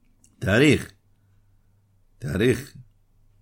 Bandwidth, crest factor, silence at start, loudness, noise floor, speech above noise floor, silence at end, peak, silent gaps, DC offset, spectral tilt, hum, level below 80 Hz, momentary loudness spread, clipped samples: 16.5 kHz; 22 dB; 0.4 s; -22 LUFS; -60 dBFS; 40 dB; 0.6 s; -4 dBFS; none; under 0.1%; -6 dB/octave; none; -50 dBFS; 21 LU; under 0.1%